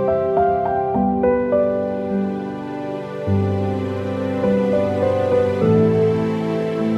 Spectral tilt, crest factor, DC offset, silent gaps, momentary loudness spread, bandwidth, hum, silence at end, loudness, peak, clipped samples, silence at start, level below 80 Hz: -9 dB/octave; 14 dB; under 0.1%; none; 9 LU; 9.8 kHz; none; 0 s; -19 LUFS; -4 dBFS; under 0.1%; 0 s; -48 dBFS